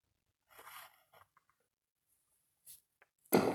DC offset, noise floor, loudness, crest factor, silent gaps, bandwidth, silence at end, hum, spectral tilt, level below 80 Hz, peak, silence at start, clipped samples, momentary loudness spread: under 0.1%; -83 dBFS; -35 LUFS; 28 dB; 1.91-1.96 s; over 20 kHz; 0 s; none; -5 dB/octave; -80 dBFS; -14 dBFS; 0.65 s; under 0.1%; 26 LU